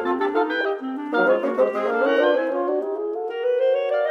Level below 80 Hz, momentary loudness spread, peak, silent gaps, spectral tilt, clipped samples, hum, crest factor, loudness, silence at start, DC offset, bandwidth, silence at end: -78 dBFS; 7 LU; -6 dBFS; none; -5.5 dB/octave; under 0.1%; none; 14 dB; -22 LUFS; 0 s; under 0.1%; 6.4 kHz; 0 s